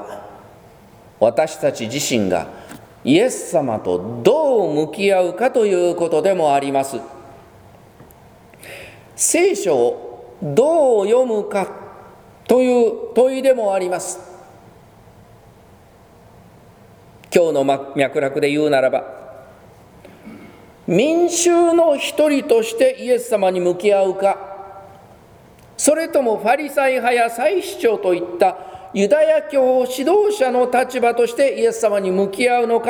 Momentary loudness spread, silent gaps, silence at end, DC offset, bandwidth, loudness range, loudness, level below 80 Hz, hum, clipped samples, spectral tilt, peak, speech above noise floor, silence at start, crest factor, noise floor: 13 LU; none; 0 s; under 0.1%; over 20 kHz; 5 LU; -17 LUFS; -58 dBFS; none; under 0.1%; -4 dB/octave; 0 dBFS; 30 dB; 0 s; 18 dB; -47 dBFS